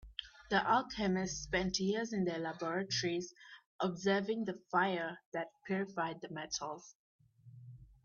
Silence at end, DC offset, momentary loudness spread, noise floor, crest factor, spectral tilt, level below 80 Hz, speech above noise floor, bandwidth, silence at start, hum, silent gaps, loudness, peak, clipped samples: 0.2 s; under 0.1%; 16 LU; -57 dBFS; 20 dB; -4 dB/octave; -62 dBFS; 20 dB; 7.4 kHz; 0.05 s; none; 3.66-3.79 s, 5.26-5.32 s, 6.95-7.19 s; -36 LUFS; -18 dBFS; under 0.1%